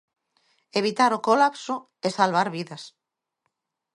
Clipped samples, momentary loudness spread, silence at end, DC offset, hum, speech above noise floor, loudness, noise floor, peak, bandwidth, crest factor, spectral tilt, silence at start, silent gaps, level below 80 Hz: under 0.1%; 13 LU; 1.1 s; under 0.1%; none; 55 dB; -23 LUFS; -79 dBFS; -4 dBFS; 11.5 kHz; 22 dB; -4.5 dB/octave; 0.75 s; none; -76 dBFS